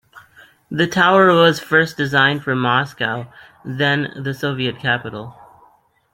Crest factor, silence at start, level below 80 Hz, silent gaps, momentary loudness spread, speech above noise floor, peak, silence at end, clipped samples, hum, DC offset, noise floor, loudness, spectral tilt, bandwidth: 18 dB; 0.15 s; -58 dBFS; none; 19 LU; 38 dB; -2 dBFS; 0.8 s; under 0.1%; none; under 0.1%; -55 dBFS; -17 LUFS; -5.5 dB/octave; 16.5 kHz